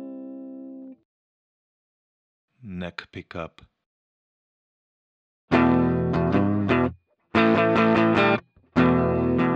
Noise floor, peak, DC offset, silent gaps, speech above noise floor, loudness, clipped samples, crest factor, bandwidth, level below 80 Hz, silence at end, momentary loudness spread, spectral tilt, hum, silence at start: -40 dBFS; -6 dBFS; under 0.1%; 1.05-2.48 s, 3.86-5.48 s; 5 dB; -21 LUFS; under 0.1%; 18 dB; 7.6 kHz; -48 dBFS; 0 s; 20 LU; -8 dB/octave; none; 0 s